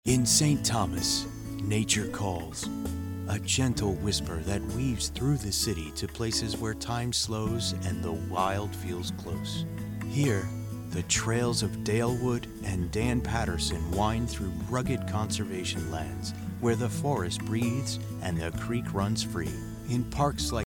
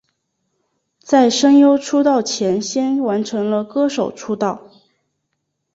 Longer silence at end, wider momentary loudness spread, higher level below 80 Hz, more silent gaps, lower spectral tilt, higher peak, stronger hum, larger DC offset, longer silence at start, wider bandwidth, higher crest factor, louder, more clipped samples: second, 0.05 s vs 1.15 s; second, 8 LU vs 11 LU; first, -44 dBFS vs -62 dBFS; neither; about the same, -4.5 dB/octave vs -4.5 dB/octave; second, -10 dBFS vs -2 dBFS; neither; neither; second, 0.05 s vs 1.05 s; first, 18 kHz vs 8 kHz; about the same, 20 dB vs 16 dB; second, -30 LUFS vs -16 LUFS; neither